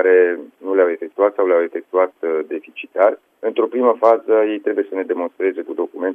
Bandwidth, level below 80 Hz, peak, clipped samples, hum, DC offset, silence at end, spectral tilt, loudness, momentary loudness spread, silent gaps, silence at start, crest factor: 3.6 kHz; -80 dBFS; -2 dBFS; under 0.1%; none; under 0.1%; 0 s; -6.5 dB/octave; -18 LUFS; 10 LU; none; 0 s; 16 dB